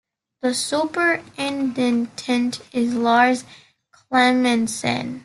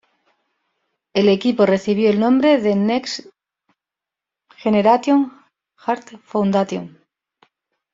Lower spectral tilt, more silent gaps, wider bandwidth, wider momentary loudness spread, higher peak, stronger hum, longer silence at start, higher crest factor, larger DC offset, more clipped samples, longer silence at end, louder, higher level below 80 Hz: second, -3.5 dB/octave vs -6.5 dB/octave; neither; first, 12.5 kHz vs 7.6 kHz; second, 8 LU vs 13 LU; about the same, -4 dBFS vs -2 dBFS; neither; second, 0.45 s vs 1.15 s; about the same, 18 dB vs 18 dB; neither; neither; second, 0 s vs 1.05 s; about the same, -20 LUFS vs -18 LUFS; about the same, -64 dBFS vs -62 dBFS